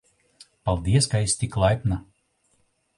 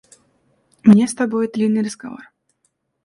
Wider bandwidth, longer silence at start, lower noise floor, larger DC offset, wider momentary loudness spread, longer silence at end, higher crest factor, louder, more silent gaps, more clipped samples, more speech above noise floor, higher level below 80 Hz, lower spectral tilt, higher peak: about the same, 11.5 kHz vs 11.5 kHz; second, 0.65 s vs 0.85 s; about the same, -68 dBFS vs -69 dBFS; neither; second, 9 LU vs 21 LU; first, 1 s vs 0.85 s; about the same, 18 dB vs 18 dB; second, -24 LUFS vs -17 LUFS; neither; neither; second, 46 dB vs 53 dB; first, -40 dBFS vs -60 dBFS; second, -5 dB/octave vs -6.5 dB/octave; second, -6 dBFS vs 0 dBFS